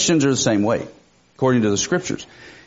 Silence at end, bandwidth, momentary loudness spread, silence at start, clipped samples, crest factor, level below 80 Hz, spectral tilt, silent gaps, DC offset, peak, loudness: 0.15 s; 8 kHz; 14 LU; 0 s; under 0.1%; 16 dB; -54 dBFS; -5 dB/octave; none; under 0.1%; -4 dBFS; -19 LUFS